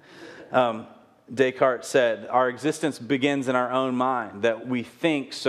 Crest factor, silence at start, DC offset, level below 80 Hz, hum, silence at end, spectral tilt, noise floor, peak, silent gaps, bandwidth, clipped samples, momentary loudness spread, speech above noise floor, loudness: 18 dB; 0.1 s; under 0.1%; -74 dBFS; none; 0 s; -5 dB/octave; -45 dBFS; -6 dBFS; none; 14 kHz; under 0.1%; 7 LU; 21 dB; -24 LUFS